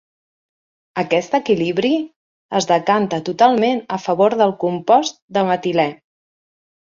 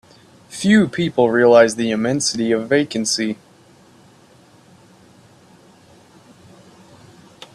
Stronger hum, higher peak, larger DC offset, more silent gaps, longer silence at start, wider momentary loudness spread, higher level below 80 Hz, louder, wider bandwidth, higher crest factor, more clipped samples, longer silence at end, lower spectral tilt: neither; about the same, -2 dBFS vs 0 dBFS; neither; first, 2.16-2.49 s, 5.22-5.28 s vs none; first, 0.95 s vs 0.5 s; second, 7 LU vs 11 LU; about the same, -64 dBFS vs -60 dBFS; about the same, -18 LUFS vs -16 LUFS; second, 7.6 kHz vs 12.5 kHz; about the same, 16 dB vs 20 dB; neither; second, 0.9 s vs 4.2 s; about the same, -5 dB/octave vs -4.5 dB/octave